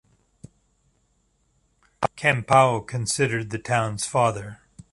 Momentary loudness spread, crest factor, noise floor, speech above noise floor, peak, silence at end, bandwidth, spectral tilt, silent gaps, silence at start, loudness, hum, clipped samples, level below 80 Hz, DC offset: 11 LU; 22 dB; -67 dBFS; 45 dB; -2 dBFS; 0.35 s; 11.5 kHz; -4.5 dB/octave; none; 2 s; -22 LUFS; none; under 0.1%; -56 dBFS; under 0.1%